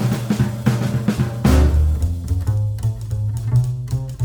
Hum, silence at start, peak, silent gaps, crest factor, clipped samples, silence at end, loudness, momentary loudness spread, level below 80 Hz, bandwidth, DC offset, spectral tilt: none; 0 s; -2 dBFS; none; 16 dB; under 0.1%; 0 s; -20 LUFS; 8 LU; -24 dBFS; over 20 kHz; under 0.1%; -7.5 dB/octave